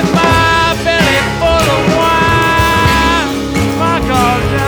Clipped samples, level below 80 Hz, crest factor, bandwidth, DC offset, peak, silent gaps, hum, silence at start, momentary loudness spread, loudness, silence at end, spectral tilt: under 0.1%; -24 dBFS; 10 dB; over 20 kHz; under 0.1%; 0 dBFS; none; none; 0 s; 4 LU; -11 LUFS; 0 s; -4.5 dB/octave